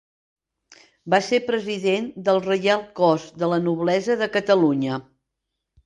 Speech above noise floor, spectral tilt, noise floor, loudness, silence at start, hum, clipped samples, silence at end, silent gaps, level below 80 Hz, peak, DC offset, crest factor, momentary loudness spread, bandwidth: 60 dB; -5.5 dB/octave; -81 dBFS; -21 LUFS; 1.05 s; none; under 0.1%; 0.85 s; none; -66 dBFS; -4 dBFS; under 0.1%; 18 dB; 6 LU; 11.5 kHz